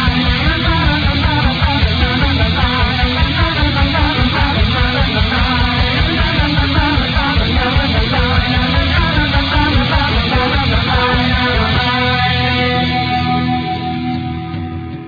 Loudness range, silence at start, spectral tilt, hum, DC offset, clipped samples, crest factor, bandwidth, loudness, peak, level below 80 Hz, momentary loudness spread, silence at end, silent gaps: 1 LU; 0 s; -7 dB/octave; none; under 0.1%; under 0.1%; 12 dB; 5 kHz; -14 LUFS; 0 dBFS; -20 dBFS; 2 LU; 0 s; none